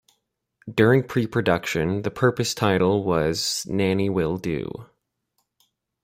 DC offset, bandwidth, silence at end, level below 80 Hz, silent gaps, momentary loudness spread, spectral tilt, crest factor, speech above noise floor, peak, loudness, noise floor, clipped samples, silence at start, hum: under 0.1%; 16.5 kHz; 1.2 s; -52 dBFS; none; 9 LU; -5.5 dB/octave; 20 dB; 52 dB; -4 dBFS; -22 LUFS; -75 dBFS; under 0.1%; 0.65 s; none